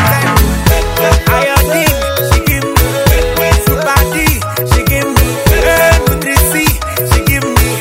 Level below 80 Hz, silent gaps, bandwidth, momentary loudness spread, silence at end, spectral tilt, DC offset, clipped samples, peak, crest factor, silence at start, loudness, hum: -16 dBFS; none; 16.5 kHz; 3 LU; 0 s; -4.5 dB/octave; under 0.1%; 0.5%; 0 dBFS; 10 dB; 0 s; -10 LUFS; none